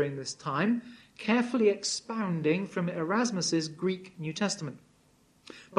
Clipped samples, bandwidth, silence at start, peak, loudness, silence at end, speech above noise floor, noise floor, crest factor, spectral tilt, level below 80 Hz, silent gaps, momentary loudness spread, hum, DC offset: under 0.1%; 11 kHz; 0 s; -10 dBFS; -30 LUFS; 0 s; 35 dB; -65 dBFS; 20 dB; -4.5 dB/octave; -74 dBFS; none; 11 LU; none; under 0.1%